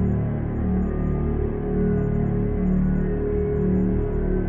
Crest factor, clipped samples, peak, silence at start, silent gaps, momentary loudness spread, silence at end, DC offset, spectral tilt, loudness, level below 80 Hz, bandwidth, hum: 10 dB; under 0.1%; -12 dBFS; 0 s; none; 3 LU; 0 s; under 0.1%; -12.5 dB/octave; -24 LUFS; -28 dBFS; 3.2 kHz; none